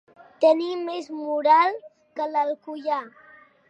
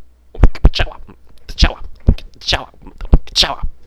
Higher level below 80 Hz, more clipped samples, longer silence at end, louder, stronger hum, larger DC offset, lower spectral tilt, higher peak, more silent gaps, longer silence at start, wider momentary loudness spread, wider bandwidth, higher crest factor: second, -84 dBFS vs -16 dBFS; second, under 0.1% vs 2%; first, 0.6 s vs 0 s; second, -23 LUFS vs -17 LUFS; neither; neither; about the same, -3.5 dB/octave vs -4.5 dB/octave; second, -6 dBFS vs 0 dBFS; neither; first, 0.4 s vs 0 s; first, 13 LU vs 10 LU; second, 8.4 kHz vs 12 kHz; about the same, 18 dB vs 14 dB